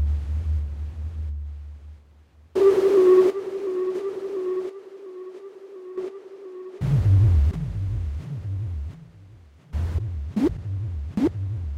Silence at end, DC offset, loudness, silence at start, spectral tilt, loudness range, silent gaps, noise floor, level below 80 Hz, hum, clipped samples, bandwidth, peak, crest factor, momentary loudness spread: 0 s; under 0.1%; -24 LUFS; 0 s; -9.5 dB/octave; 8 LU; none; -53 dBFS; -32 dBFS; none; under 0.1%; 9.6 kHz; -10 dBFS; 14 dB; 22 LU